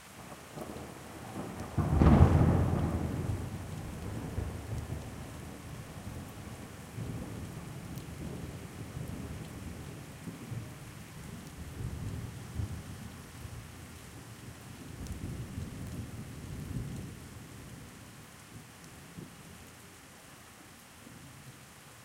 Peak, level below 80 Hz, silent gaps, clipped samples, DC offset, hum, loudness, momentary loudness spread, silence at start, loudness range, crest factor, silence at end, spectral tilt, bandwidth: -8 dBFS; -44 dBFS; none; under 0.1%; under 0.1%; none; -36 LUFS; 18 LU; 0 s; 20 LU; 28 dB; 0 s; -7 dB/octave; 16 kHz